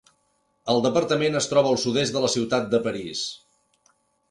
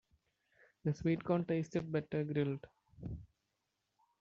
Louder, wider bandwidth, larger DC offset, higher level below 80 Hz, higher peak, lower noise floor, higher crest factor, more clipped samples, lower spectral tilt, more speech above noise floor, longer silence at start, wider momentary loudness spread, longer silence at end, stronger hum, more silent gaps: first, -23 LUFS vs -38 LUFS; first, 11.5 kHz vs 7.4 kHz; neither; about the same, -62 dBFS vs -64 dBFS; first, -6 dBFS vs -20 dBFS; second, -69 dBFS vs -85 dBFS; about the same, 18 dB vs 18 dB; neither; second, -4 dB/octave vs -8 dB/octave; about the same, 46 dB vs 49 dB; second, 0.65 s vs 0.85 s; second, 9 LU vs 13 LU; about the same, 0.95 s vs 0.95 s; neither; neither